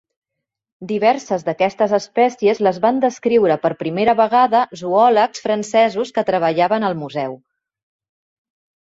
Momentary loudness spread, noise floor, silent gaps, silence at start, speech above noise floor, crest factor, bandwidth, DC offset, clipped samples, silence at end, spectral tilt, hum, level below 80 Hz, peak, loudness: 8 LU; -81 dBFS; none; 0.8 s; 65 dB; 16 dB; 8 kHz; under 0.1%; under 0.1%; 1.5 s; -5.5 dB/octave; none; -64 dBFS; -2 dBFS; -17 LUFS